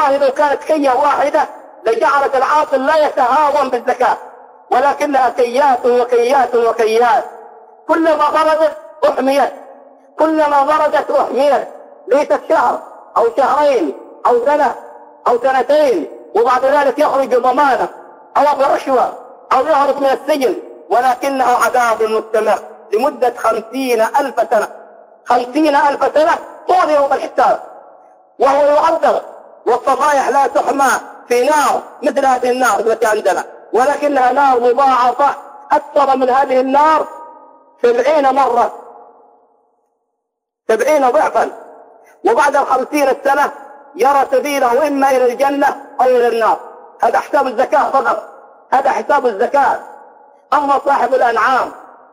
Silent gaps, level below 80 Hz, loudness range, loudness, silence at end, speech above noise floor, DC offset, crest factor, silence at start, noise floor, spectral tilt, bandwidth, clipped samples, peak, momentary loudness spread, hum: none; -58 dBFS; 2 LU; -14 LUFS; 0.35 s; 63 dB; under 0.1%; 12 dB; 0 s; -76 dBFS; -3 dB/octave; 16 kHz; under 0.1%; -2 dBFS; 7 LU; none